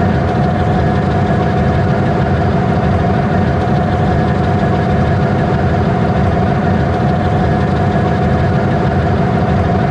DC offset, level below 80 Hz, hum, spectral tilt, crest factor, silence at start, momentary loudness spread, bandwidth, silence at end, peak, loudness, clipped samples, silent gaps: under 0.1%; -24 dBFS; none; -8.5 dB/octave; 8 dB; 0 s; 0 LU; 8.8 kHz; 0 s; -4 dBFS; -13 LUFS; under 0.1%; none